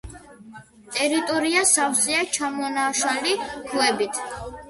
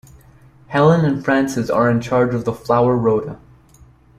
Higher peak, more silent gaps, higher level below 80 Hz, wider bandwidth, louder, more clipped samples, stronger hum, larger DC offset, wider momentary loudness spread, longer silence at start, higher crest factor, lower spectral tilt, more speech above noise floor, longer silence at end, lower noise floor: about the same, -4 dBFS vs -2 dBFS; neither; about the same, -52 dBFS vs -48 dBFS; second, 12 kHz vs 14.5 kHz; second, -21 LUFS vs -17 LUFS; neither; neither; neither; about the same, 10 LU vs 8 LU; second, 0.05 s vs 0.7 s; about the same, 20 dB vs 16 dB; second, -1 dB/octave vs -7.5 dB/octave; second, 22 dB vs 32 dB; second, 0 s vs 0.85 s; about the same, -45 dBFS vs -48 dBFS